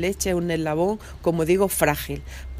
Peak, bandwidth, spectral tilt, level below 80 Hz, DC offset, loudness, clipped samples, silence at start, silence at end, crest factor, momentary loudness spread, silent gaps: -4 dBFS; 16 kHz; -5 dB/octave; -40 dBFS; under 0.1%; -23 LUFS; under 0.1%; 0 s; 0 s; 20 dB; 8 LU; none